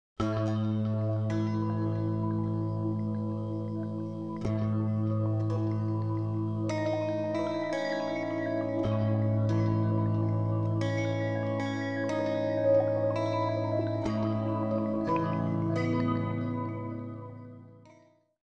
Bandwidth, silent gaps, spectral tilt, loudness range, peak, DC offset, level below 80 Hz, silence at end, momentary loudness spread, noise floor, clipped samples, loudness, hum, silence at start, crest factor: 7 kHz; none; -8.5 dB/octave; 3 LU; -14 dBFS; 0.2%; -58 dBFS; 0.4 s; 6 LU; -61 dBFS; under 0.1%; -30 LUFS; none; 0.2 s; 16 dB